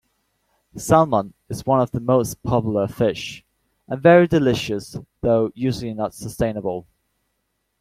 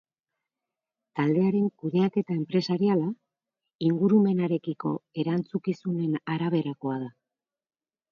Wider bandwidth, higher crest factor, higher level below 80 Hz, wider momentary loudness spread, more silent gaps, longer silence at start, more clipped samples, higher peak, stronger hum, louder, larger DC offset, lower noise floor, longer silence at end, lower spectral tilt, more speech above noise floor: first, 16 kHz vs 6.8 kHz; about the same, 20 dB vs 16 dB; first, -48 dBFS vs -74 dBFS; first, 17 LU vs 10 LU; second, none vs 3.75-3.79 s; second, 0.75 s vs 1.15 s; neither; first, -2 dBFS vs -10 dBFS; neither; first, -20 LUFS vs -27 LUFS; neither; second, -73 dBFS vs -90 dBFS; about the same, 1 s vs 1 s; second, -6.5 dB/octave vs -9 dB/octave; second, 54 dB vs 64 dB